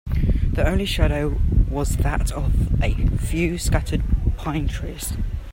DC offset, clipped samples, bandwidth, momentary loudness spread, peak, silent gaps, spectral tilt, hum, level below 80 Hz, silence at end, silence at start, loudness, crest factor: under 0.1%; under 0.1%; 16.5 kHz; 6 LU; -2 dBFS; none; -6 dB/octave; none; -22 dBFS; 0 s; 0.05 s; -23 LUFS; 18 dB